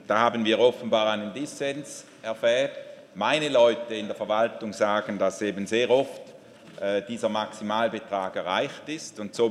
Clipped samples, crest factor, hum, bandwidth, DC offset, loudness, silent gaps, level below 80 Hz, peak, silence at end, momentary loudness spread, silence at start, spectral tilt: under 0.1%; 20 dB; none; 12.5 kHz; under 0.1%; -26 LUFS; none; -76 dBFS; -6 dBFS; 0 s; 13 LU; 0 s; -4 dB/octave